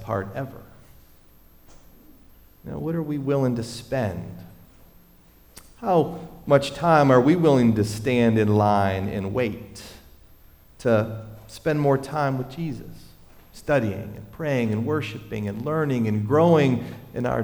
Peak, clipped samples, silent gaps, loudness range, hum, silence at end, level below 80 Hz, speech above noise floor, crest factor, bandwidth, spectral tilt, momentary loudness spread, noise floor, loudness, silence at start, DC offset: -4 dBFS; under 0.1%; none; 9 LU; none; 0 s; -50 dBFS; 31 dB; 18 dB; over 20 kHz; -7.5 dB/octave; 19 LU; -53 dBFS; -23 LUFS; 0 s; under 0.1%